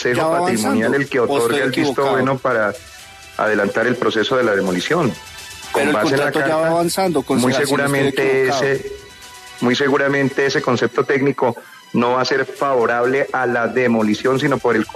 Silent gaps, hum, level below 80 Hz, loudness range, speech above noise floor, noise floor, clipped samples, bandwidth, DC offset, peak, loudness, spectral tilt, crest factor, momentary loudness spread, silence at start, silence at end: none; none; -54 dBFS; 1 LU; 21 dB; -38 dBFS; under 0.1%; 13.5 kHz; under 0.1%; -4 dBFS; -17 LUFS; -5 dB/octave; 14 dB; 7 LU; 0 s; 0 s